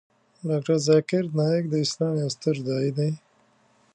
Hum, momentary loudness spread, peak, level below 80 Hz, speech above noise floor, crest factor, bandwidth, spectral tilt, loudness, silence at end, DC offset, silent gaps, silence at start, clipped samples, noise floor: none; 8 LU; -8 dBFS; -70 dBFS; 39 dB; 18 dB; 9.8 kHz; -6 dB/octave; -24 LUFS; 0.8 s; under 0.1%; none; 0.45 s; under 0.1%; -62 dBFS